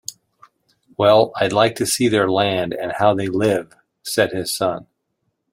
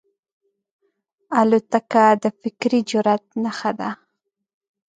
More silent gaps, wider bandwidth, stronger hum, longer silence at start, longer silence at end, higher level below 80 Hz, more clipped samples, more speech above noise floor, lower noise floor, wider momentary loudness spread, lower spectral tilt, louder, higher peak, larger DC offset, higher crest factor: neither; first, 16.5 kHz vs 9.2 kHz; neither; second, 0.1 s vs 1.3 s; second, 0.7 s vs 1 s; first, -58 dBFS vs -72 dBFS; neither; about the same, 55 dB vs 58 dB; second, -72 dBFS vs -77 dBFS; about the same, 9 LU vs 11 LU; second, -4 dB/octave vs -5.5 dB/octave; about the same, -18 LUFS vs -20 LUFS; about the same, -2 dBFS vs -2 dBFS; neither; about the same, 18 dB vs 18 dB